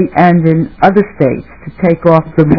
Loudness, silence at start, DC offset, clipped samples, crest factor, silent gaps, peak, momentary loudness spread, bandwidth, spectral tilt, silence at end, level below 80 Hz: -10 LUFS; 0 s; 0.8%; 3%; 10 dB; none; 0 dBFS; 7 LU; 5.4 kHz; -10.5 dB/octave; 0 s; -38 dBFS